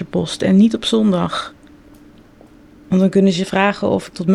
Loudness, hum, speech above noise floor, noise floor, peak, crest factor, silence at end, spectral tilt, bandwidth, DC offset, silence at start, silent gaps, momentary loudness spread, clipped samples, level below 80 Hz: -16 LUFS; none; 30 dB; -45 dBFS; -2 dBFS; 14 dB; 0 s; -6.5 dB/octave; 11 kHz; under 0.1%; 0 s; none; 9 LU; under 0.1%; -50 dBFS